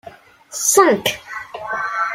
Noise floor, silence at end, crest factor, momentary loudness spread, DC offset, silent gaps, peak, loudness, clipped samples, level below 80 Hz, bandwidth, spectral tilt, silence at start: -42 dBFS; 0 s; 18 dB; 17 LU; under 0.1%; none; 0 dBFS; -16 LUFS; under 0.1%; -60 dBFS; 16 kHz; -1.5 dB/octave; 0.05 s